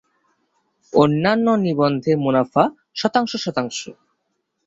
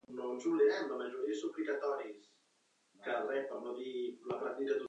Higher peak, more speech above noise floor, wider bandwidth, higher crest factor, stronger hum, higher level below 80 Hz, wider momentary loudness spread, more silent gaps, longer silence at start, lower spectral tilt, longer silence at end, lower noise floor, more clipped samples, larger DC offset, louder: first, -2 dBFS vs -20 dBFS; first, 55 dB vs 38 dB; about the same, 8 kHz vs 8.2 kHz; about the same, 18 dB vs 16 dB; neither; first, -58 dBFS vs under -90 dBFS; second, 8 LU vs 11 LU; neither; first, 0.95 s vs 0.1 s; first, -6 dB/octave vs -4.5 dB/octave; first, 0.75 s vs 0 s; about the same, -73 dBFS vs -75 dBFS; neither; neither; first, -19 LUFS vs -38 LUFS